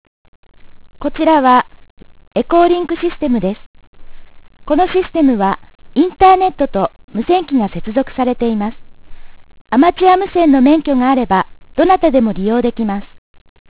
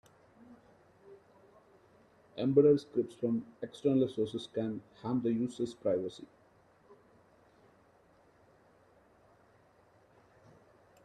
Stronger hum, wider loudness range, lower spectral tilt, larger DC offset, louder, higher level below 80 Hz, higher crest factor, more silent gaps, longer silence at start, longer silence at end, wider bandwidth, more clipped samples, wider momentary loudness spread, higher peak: neither; second, 5 LU vs 9 LU; first, -10 dB/octave vs -8 dB/octave; first, 0.4% vs under 0.1%; first, -14 LUFS vs -33 LUFS; first, -40 dBFS vs -76 dBFS; second, 14 dB vs 22 dB; first, 1.90-1.97 s, 3.66-3.74 s, 3.87-3.93 s, 7.04-7.08 s, 9.61-9.65 s vs none; first, 0.65 s vs 0.5 s; second, 0.65 s vs 4.8 s; second, 4 kHz vs 10.5 kHz; neither; second, 12 LU vs 17 LU; first, 0 dBFS vs -14 dBFS